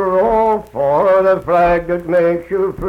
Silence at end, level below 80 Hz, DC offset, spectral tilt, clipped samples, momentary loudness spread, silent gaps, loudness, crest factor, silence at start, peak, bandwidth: 0 s; -38 dBFS; under 0.1%; -8 dB/octave; under 0.1%; 5 LU; none; -14 LUFS; 10 dB; 0 s; -4 dBFS; 6.2 kHz